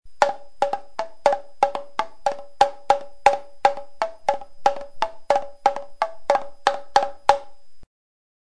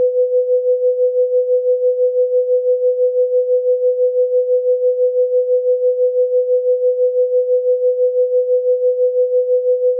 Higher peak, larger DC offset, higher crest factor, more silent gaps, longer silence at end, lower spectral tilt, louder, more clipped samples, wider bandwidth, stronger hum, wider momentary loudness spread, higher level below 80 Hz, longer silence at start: first, 0 dBFS vs -8 dBFS; first, 2% vs under 0.1%; first, 24 dB vs 6 dB; neither; first, 0.6 s vs 0 s; first, -2 dB/octave vs 5.5 dB/octave; second, -24 LUFS vs -15 LUFS; neither; first, 11 kHz vs 0.7 kHz; neither; first, 8 LU vs 1 LU; first, -52 dBFS vs under -90 dBFS; about the same, 0 s vs 0 s